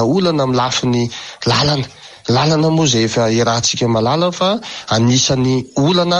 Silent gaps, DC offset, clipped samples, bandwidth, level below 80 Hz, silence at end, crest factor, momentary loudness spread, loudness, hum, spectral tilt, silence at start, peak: none; under 0.1%; under 0.1%; 10.5 kHz; -46 dBFS; 0 s; 12 dB; 6 LU; -15 LUFS; none; -4.5 dB/octave; 0 s; -2 dBFS